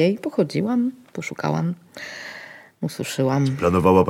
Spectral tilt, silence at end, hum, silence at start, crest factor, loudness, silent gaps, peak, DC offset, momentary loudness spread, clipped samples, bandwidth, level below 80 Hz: -6.5 dB/octave; 0 s; none; 0 s; 18 dB; -23 LUFS; none; -4 dBFS; under 0.1%; 15 LU; under 0.1%; 16.5 kHz; -52 dBFS